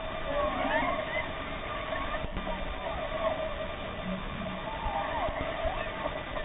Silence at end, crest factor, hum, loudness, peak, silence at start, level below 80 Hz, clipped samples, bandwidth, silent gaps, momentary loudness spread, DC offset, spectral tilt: 0 s; 16 dB; none; -33 LUFS; -18 dBFS; 0 s; -42 dBFS; under 0.1%; 4 kHz; none; 7 LU; under 0.1%; -9 dB/octave